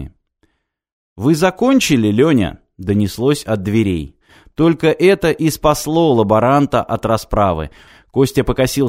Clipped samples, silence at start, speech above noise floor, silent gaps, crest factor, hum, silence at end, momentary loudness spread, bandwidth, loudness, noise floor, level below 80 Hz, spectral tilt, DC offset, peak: under 0.1%; 0 s; 49 dB; 0.92-1.16 s; 16 dB; none; 0 s; 11 LU; 16 kHz; -15 LUFS; -63 dBFS; -36 dBFS; -6 dB/octave; under 0.1%; 0 dBFS